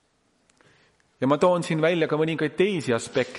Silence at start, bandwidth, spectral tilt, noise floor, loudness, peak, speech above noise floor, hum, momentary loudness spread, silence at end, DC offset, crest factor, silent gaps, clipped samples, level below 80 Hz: 1.2 s; 11.5 kHz; -6 dB/octave; -66 dBFS; -23 LUFS; -8 dBFS; 43 dB; none; 4 LU; 0 s; under 0.1%; 18 dB; none; under 0.1%; -66 dBFS